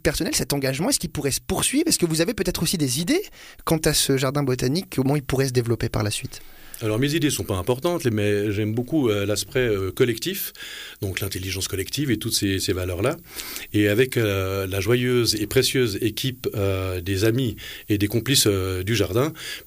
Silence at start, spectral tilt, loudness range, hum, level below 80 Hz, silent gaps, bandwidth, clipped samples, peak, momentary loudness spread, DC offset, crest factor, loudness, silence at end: 0.05 s; -4.5 dB/octave; 3 LU; none; -44 dBFS; none; 15.5 kHz; under 0.1%; -6 dBFS; 8 LU; under 0.1%; 16 dB; -23 LUFS; 0 s